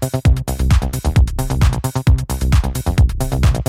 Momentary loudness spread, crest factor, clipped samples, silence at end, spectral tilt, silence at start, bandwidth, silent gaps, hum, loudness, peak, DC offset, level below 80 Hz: 2 LU; 12 dB; under 0.1%; 0.05 s; -6 dB/octave; 0 s; 16 kHz; none; none; -17 LUFS; -2 dBFS; under 0.1%; -18 dBFS